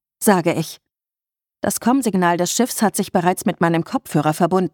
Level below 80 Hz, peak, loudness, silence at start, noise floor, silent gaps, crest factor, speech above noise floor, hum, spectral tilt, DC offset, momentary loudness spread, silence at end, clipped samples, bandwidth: -60 dBFS; -2 dBFS; -19 LUFS; 0.2 s; under -90 dBFS; none; 18 dB; over 72 dB; none; -5 dB/octave; under 0.1%; 5 LU; 0.05 s; under 0.1%; 19 kHz